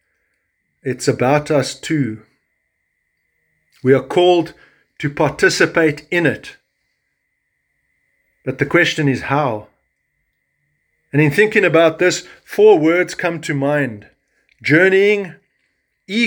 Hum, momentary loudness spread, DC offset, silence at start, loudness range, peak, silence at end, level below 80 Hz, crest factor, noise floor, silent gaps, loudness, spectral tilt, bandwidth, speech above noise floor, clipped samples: none; 14 LU; under 0.1%; 0.85 s; 6 LU; 0 dBFS; 0 s; -56 dBFS; 18 dB; -70 dBFS; none; -16 LUFS; -5.5 dB/octave; 19.5 kHz; 55 dB; under 0.1%